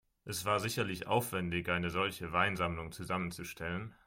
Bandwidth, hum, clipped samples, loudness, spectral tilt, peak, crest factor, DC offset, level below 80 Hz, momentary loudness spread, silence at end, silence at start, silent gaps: 16.5 kHz; none; under 0.1%; -35 LUFS; -4.5 dB/octave; -14 dBFS; 20 dB; under 0.1%; -60 dBFS; 8 LU; 0.15 s; 0.25 s; none